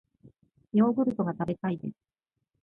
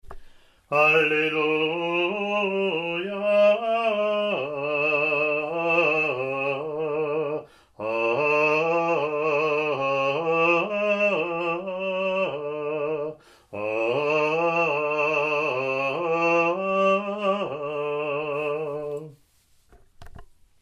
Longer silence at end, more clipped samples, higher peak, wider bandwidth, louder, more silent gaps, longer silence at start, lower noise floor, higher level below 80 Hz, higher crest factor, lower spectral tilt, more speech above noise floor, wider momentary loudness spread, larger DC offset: first, 0.7 s vs 0.35 s; neither; second, -14 dBFS vs -8 dBFS; second, 3.7 kHz vs 10.5 kHz; second, -28 LUFS vs -24 LUFS; neither; first, 0.25 s vs 0.05 s; about the same, -59 dBFS vs -61 dBFS; second, -68 dBFS vs -60 dBFS; about the same, 18 dB vs 18 dB; first, -10.5 dB/octave vs -5.5 dB/octave; second, 32 dB vs 38 dB; first, 11 LU vs 8 LU; neither